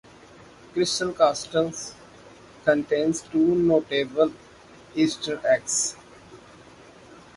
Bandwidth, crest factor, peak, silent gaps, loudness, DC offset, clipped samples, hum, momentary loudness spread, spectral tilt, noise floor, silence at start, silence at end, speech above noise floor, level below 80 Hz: 11.5 kHz; 20 dB; -6 dBFS; none; -24 LUFS; under 0.1%; under 0.1%; none; 9 LU; -3.5 dB/octave; -49 dBFS; 0.75 s; 0.2 s; 26 dB; -60 dBFS